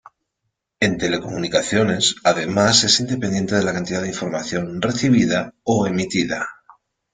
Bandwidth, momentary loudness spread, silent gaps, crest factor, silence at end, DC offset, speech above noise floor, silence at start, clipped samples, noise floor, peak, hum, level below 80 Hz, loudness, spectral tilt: 9.6 kHz; 10 LU; none; 18 dB; 0.6 s; under 0.1%; 57 dB; 0.8 s; under 0.1%; -77 dBFS; -2 dBFS; none; -52 dBFS; -19 LUFS; -4 dB/octave